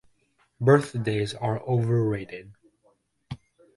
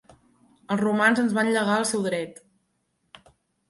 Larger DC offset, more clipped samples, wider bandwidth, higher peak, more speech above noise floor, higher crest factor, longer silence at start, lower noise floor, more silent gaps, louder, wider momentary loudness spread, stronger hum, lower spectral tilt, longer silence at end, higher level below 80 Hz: neither; neither; about the same, 11.5 kHz vs 11.5 kHz; about the same, -6 dBFS vs -8 dBFS; second, 43 dB vs 50 dB; about the same, 22 dB vs 18 dB; about the same, 0.6 s vs 0.7 s; second, -67 dBFS vs -73 dBFS; neither; about the same, -25 LUFS vs -23 LUFS; first, 22 LU vs 10 LU; neither; first, -7.5 dB/octave vs -4.5 dB/octave; second, 0.4 s vs 1.35 s; first, -58 dBFS vs -70 dBFS